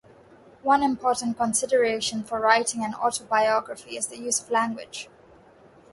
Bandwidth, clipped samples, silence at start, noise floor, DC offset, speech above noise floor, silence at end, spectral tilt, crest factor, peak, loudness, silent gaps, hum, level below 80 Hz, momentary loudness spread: 12 kHz; under 0.1%; 0.65 s; -53 dBFS; under 0.1%; 29 dB; 0.9 s; -2 dB/octave; 22 dB; -4 dBFS; -24 LUFS; none; none; -64 dBFS; 11 LU